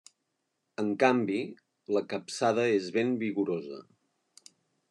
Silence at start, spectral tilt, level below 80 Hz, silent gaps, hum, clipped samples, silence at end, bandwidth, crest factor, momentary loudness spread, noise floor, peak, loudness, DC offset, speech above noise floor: 0.8 s; -5.5 dB/octave; -86 dBFS; none; none; under 0.1%; 1.1 s; 11.5 kHz; 20 dB; 18 LU; -81 dBFS; -12 dBFS; -29 LUFS; under 0.1%; 52 dB